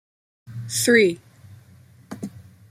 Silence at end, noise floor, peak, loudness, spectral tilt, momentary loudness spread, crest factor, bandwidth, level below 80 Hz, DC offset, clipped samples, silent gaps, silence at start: 0.35 s; -51 dBFS; -4 dBFS; -19 LUFS; -3.5 dB/octave; 23 LU; 20 dB; 16 kHz; -66 dBFS; under 0.1%; under 0.1%; none; 0.5 s